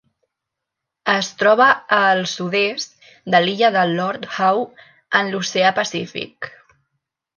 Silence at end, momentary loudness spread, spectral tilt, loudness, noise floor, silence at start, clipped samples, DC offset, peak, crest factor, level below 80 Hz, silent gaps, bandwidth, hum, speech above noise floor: 0.9 s; 16 LU; -3.5 dB/octave; -18 LUFS; -82 dBFS; 1.05 s; under 0.1%; under 0.1%; -2 dBFS; 18 dB; -68 dBFS; none; 10 kHz; none; 64 dB